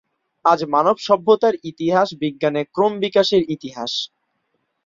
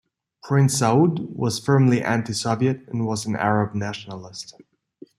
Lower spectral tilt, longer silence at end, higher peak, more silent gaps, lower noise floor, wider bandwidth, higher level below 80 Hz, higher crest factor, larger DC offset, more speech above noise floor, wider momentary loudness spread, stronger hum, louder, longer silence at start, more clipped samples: about the same, -5.5 dB/octave vs -6 dB/octave; about the same, 0.8 s vs 0.7 s; about the same, -2 dBFS vs -4 dBFS; neither; first, -71 dBFS vs -49 dBFS; second, 7.6 kHz vs 13.5 kHz; about the same, -62 dBFS vs -60 dBFS; about the same, 18 dB vs 18 dB; neither; first, 53 dB vs 28 dB; second, 8 LU vs 17 LU; neither; about the same, -19 LUFS vs -21 LUFS; about the same, 0.45 s vs 0.45 s; neither